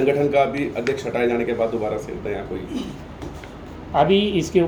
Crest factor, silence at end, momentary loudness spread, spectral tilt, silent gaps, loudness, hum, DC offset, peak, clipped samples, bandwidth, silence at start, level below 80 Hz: 18 dB; 0 s; 17 LU; -6 dB/octave; none; -22 LUFS; none; under 0.1%; -4 dBFS; under 0.1%; 19.5 kHz; 0 s; -44 dBFS